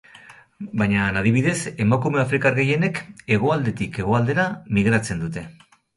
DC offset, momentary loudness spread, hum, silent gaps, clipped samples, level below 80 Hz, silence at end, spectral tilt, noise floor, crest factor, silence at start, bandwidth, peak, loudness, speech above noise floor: under 0.1%; 11 LU; none; none; under 0.1%; -48 dBFS; 0.45 s; -6.5 dB/octave; -47 dBFS; 16 dB; 0.3 s; 11.5 kHz; -6 dBFS; -21 LUFS; 26 dB